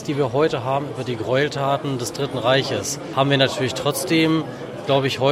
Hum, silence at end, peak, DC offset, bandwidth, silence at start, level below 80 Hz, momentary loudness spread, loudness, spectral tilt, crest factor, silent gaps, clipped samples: none; 0 s; -2 dBFS; under 0.1%; 16 kHz; 0 s; -56 dBFS; 7 LU; -21 LUFS; -4.5 dB/octave; 18 dB; none; under 0.1%